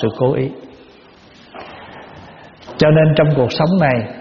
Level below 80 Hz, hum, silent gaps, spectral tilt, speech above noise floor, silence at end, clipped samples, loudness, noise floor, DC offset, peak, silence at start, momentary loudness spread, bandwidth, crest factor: -46 dBFS; none; none; -6 dB/octave; 30 dB; 0 s; under 0.1%; -14 LUFS; -44 dBFS; under 0.1%; 0 dBFS; 0 s; 24 LU; 6.6 kHz; 16 dB